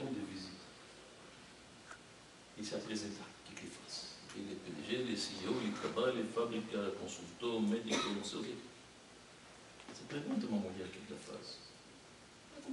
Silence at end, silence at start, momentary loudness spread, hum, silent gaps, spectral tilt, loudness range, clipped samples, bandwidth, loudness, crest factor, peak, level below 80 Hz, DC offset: 0 s; 0 s; 20 LU; none; none; -4 dB/octave; 9 LU; under 0.1%; 11.5 kHz; -41 LUFS; 20 dB; -22 dBFS; -74 dBFS; under 0.1%